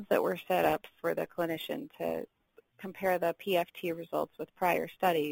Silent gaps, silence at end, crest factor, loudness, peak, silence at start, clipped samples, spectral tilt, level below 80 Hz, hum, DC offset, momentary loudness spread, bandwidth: none; 0 s; 20 dB; -33 LUFS; -12 dBFS; 0 s; under 0.1%; -5 dB/octave; -68 dBFS; none; under 0.1%; 10 LU; 17 kHz